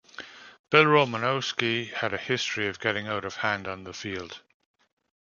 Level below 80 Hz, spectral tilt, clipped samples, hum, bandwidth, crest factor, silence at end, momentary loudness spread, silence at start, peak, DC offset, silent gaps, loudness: -62 dBFS; -4.5 dB/octave; under 0.1%; none; 7.2 kHz; 26 dB; 0.9 s; 20 LU; 0.2 s; -2 dBFS; under 0.1%; 0.59-0.64 s; -26 LUFS